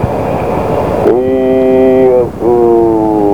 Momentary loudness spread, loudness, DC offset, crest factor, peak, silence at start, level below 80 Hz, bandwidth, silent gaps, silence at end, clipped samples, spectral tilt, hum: 6 LU; -10 LUFS; 2%; 10 dB; 0 dBFS; 0 s; -32 dBFS; 15.5 kHz; none; 0 s; 0.1%; -9 dB/octave; none